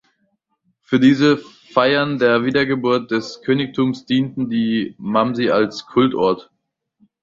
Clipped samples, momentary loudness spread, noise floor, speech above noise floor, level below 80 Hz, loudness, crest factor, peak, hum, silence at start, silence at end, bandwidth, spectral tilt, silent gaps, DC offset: under 0.1%; 6 LU; -68 dBFS; 51 dB; -56 dBFS; -18 LUFS; 16 dB; -2 dBFS; none; 0.9 s; 0.8 s; 7.6 kHz; -6.5 dB/octave; none; under 0.1%